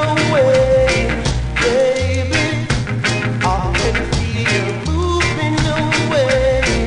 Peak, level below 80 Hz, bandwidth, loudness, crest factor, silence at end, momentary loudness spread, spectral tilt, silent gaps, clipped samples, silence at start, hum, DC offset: -4 dBFS; -26 dBFS; 10.5 kHz; -16 LUFS; 12 dB; 0 s; 6 LU; -5 dB/octave; none; under 0.1%; 0 s; none; under 0.1%